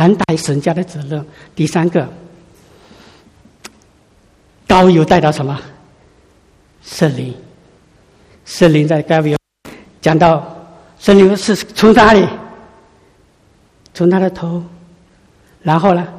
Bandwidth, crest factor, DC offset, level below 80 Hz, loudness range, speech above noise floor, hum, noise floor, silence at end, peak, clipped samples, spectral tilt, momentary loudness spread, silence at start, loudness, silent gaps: 15 kHz; 14 dB; under 0.1%; -42 dBFS; 10 LU; 39 dB; none; -51 dBFS; 0 s; 0 dBFS; 0.3%; -6.5 dB/octave; 19 LU; 0 s; -12 LUFS; none